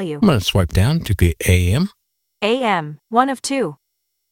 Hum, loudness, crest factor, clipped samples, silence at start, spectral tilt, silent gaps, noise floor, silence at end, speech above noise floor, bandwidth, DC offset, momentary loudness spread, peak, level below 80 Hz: none; -18 LUFS; 16 dB; under 0.1%; 0 s; -5.5 dB/octave; none; -73 dBFS; 0.6 s; 57 dB; 17 kHz; under 0.1%; 7 LU; -2 dBFS; -32 dBFS